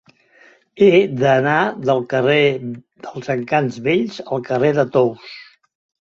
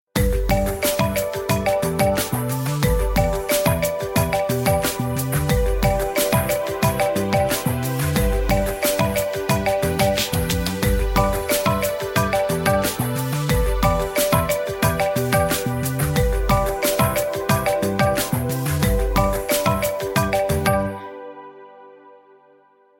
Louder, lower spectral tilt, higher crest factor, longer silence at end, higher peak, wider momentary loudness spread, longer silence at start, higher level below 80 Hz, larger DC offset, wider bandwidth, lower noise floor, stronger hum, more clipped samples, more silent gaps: first, -17 LUFS vs -20 LUFS; first, -7 dB/octave vs -5 dB/octave; about the same, 16 dB vs 18 dB; second, 0.6 s vs 0.9 s; about the same, -2 dBFS vs -2 dBFS; first, 18 LU vs 3 LU; first, 0.75 s vs 0.15 s; second, -60 dBFS vs -28 dBFS; neither; second, 7.4 kHz vs 17 kHz; second, -51 dBFS vs -55 dBFS; neither; neither; neither